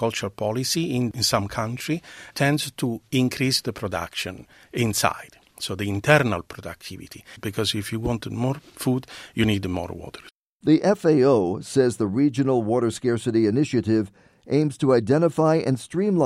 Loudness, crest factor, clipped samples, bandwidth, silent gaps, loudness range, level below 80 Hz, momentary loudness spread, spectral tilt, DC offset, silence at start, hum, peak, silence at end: -23 LUFS; 22 dB; under 0.1%; 15.5 kHz; 10.32-10.60 s; 5 LU; -52 dBFS; 15 LU; -5.5 dB/octave; under 0.1%; 0 s; none; 0 dBFS; 0 s